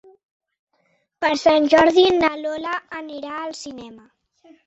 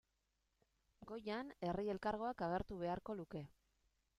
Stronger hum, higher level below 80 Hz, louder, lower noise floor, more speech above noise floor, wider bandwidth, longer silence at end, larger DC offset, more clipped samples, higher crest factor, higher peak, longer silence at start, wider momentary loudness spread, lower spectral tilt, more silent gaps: neither; first, -56 dBFS vs -66 dBFS; first, -18 LUFS vs -45 LUFS; second, -67 dBFS vs -86 dBFS; first, 48 dB vs 41 dB; second, 8.2 kHz vs 13 kHz; about the same, 0.7 s vs 0.65 s; neither; neither; about the same, 18 dB vs 20 dB; first, -2 dBFS vs -28 dBFS; first, 1.2 s vs 1 s; first, 19 LU vs 11 LU; second, -3.5 dB/octave vs -7.5 dB/octave; neither